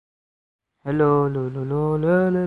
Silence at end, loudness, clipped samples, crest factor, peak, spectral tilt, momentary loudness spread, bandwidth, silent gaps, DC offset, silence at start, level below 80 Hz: 0 s; -21 LUFS; under 0.1%; 16 dB; -6 dBFS; -10.5 dB/octave; 8 LU; 4.4 kHz; none; under 0.1%; 0.85 s; -52 dBFS